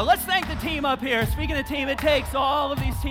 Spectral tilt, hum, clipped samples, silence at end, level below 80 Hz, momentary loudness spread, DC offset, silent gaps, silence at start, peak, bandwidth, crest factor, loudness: -4.5 dB/octave; none; under 0.1%; 0 s; -34 dBFS; 5 LU; under 0.1%; none; 0 s; -6 dBFS; 19.5 kHz; 16 dB; -24 LUFS